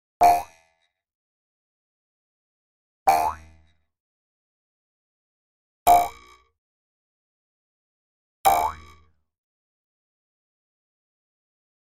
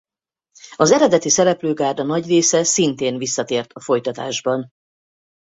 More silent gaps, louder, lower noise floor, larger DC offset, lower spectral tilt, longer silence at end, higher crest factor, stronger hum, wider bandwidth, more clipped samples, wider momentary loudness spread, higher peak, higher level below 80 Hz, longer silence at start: first, 1.15-3.06 s, 4.00-5.86 s, 6.58-8.44 s vs none; second, -22 LUFS vs -18 LUFS; second, -69 dBFS vs -80 dBFS; neither; about the same, -3 dB/octave vs -3.5 dB/octave; first, 3.1 s vs 0.9 s; first, 24 dB vs 18 dB; neither; first, 16 kHz vs 8.2 kHz; neither; first, 12 LU vs 9 LU; about the same, -4 dBFS vs -2 dBFS; first, -54 dBFS vs -60 dBFS; second, 0.2 s vs 0.65 s